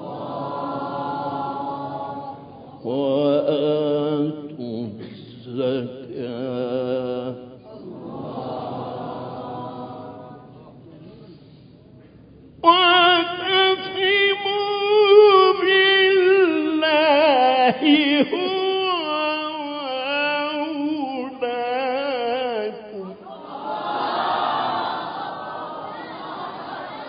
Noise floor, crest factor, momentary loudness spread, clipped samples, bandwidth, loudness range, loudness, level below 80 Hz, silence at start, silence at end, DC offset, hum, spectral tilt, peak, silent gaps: -47 dBFS; 20 dB; 19 LU; under 0.1%; 5.2 kHz; 17 LU; -20 LUFS; -64 dBFS; 0 s; 0 s; under 0.1%; none; -9 dB/octave; -2 dBFS; none